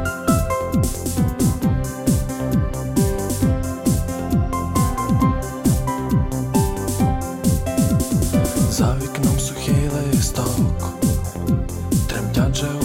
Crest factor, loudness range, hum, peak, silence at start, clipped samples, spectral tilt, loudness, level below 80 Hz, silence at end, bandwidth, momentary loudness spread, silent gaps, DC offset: 16 dB; 1 LU; none; -4 dBFS; 0 s; under 0.1%; -6 dB/octave; -20 LUFS; -28 dBFS; 0 s; 17 kHz; 3 LU; none; under 0.1%